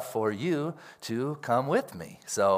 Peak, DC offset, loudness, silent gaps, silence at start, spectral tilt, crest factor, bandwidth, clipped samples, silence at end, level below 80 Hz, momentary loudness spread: -12 dBFS; under 0.1%; -30 LUFS; none; 0 s; -5 dB/octave; 16 dB; 16 kHz; under 0.1%; 0 s; -74 dBFS; 15 LU